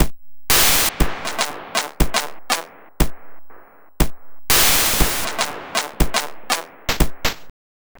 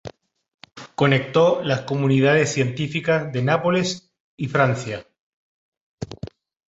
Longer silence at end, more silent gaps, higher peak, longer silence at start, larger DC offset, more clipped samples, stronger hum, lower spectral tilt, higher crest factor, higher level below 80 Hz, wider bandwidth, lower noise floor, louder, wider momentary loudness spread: about the same, 0.5 s vs 0.4 s; second, none vs 0.54-0.58 s, 4.20-4.38 s, 5.20-5.72 s, 5.81-5.98 s; about the same, -2 dBFS vs -2 dBFS; about the same, 0 s vs 0.05 s; neither; neither; neither; second, -2 dB/octave vs -5.5 dB/octave; about the same, 18 dB vs 20 dB; first, -28 dBFS vs -56 dBFS; first, over 20 kHz vs 8 kHz; about the same, -39 dBFS vs -42 dBFS; about the same, -19 LUFS vs -20 LUFS; second, 12 LU vs 19 LU